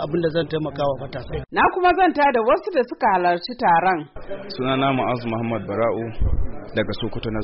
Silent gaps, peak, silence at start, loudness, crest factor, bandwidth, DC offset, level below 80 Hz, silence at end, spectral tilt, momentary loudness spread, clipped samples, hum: none; -8 dBFS; 0 s; -21 LUFS; 14 dB; 5.8 kHz; under 0.1%; -34 dBFS; 0 s; -4 dB/octave; 10 LU; under 0.1%; none